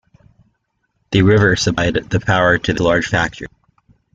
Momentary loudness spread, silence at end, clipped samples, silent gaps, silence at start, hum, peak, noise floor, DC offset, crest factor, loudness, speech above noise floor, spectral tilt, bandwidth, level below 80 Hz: 9 LU; 0.7 s; under 0.1%; none; 1.1 s; none; -2 dBFS; -68 dBFS; under 0.1%; 16 dB; -15 LUFS; 53 dB; -5.5 dB/octave; 7.8 kHz; -40 dBFS